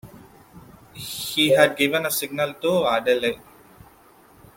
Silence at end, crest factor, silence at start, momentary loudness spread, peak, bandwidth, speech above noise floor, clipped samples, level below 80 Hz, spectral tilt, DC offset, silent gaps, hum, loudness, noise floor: 1.2 s; 20 dB; 0.05 s; 14 LU; -4 dBFS; 17 kHz; 31 dB; under 0.1%; -60 dBFS; -3.5 dB/octave; under 0.1%; none; none; -21 LUFS; -52 dBFS